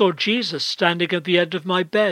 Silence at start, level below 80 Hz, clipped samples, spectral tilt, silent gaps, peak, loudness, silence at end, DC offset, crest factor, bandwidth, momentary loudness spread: 0 s; -74 dBFS; under 0.1%; -5 dB/octave; none; -2 dBFS; -20 LUFS; 0 s; under 0.1%; 18 dB; 13.5 kHz; 3 LU